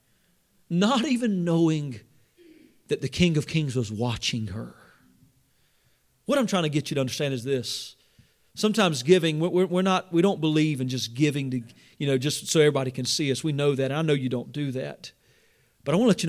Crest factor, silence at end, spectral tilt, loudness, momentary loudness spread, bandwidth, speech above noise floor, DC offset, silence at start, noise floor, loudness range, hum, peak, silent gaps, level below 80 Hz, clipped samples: 20 dB; 0 s; -5.5 dB/octave; -25 LUFS; 12 LU; 16 kHz; 41 dB; under 0.1%; 0.7 s; -66 dBFS; 5 LU; none; -6 dBFS; none; -56 dBFS; under 0.1%